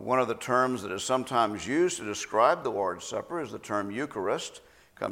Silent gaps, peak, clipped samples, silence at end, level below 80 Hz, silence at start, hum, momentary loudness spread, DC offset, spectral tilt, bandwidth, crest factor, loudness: none; -8 dBFS; under 0.1%; 0 s; -66 dBFS; 0 s; none; 10 LU; under 0.1%; -4 dB/octave; 16.5 kHz; 20 dB; -29 LUFS